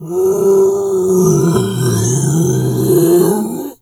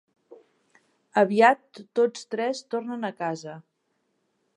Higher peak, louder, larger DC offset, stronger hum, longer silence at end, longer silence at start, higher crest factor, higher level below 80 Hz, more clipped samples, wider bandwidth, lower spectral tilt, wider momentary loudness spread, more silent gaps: first, 0 dBFS vs -4 dBFS; first, -13 LUFS vs -25 LUFS; neither; neither; second, 0.1 s vs 0.95 s; second, 0 s vs 0.3 s; second, 12 dB vs 22 dB; first, -46 dBFS vs -84 dBFS; neither; first, 18.5 kHz vs 11 kHz; first, -6.5 dB/octave vs -5 dB/octave; second, 4 LU vs 15 LU; neither